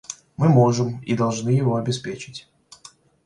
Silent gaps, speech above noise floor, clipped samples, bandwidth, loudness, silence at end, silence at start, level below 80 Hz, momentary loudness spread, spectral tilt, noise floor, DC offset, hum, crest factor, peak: none; 30 dB; under 0.1%; 10.5 kHz; -21 LUFS; 0.85 s; 0.1 s; -58 dBFS; 19 LU; -6.5 dB/octave; -50 dBFS; under 0.1%; none; 18 dB; -4 dBFS